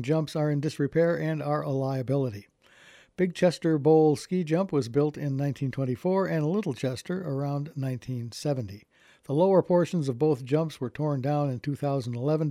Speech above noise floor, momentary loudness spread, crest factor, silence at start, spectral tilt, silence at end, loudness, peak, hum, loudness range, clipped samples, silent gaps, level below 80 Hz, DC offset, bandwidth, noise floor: 29 dB; 10 LU; 18 dB; 0 s; -7.5 dB/octave; 0 s; -27 LUFS; -10 dBFS; none; 4 LU; under 0.1%; none; -66 dBFS; under 0.1%; 14.5 kHz; -56 dBFS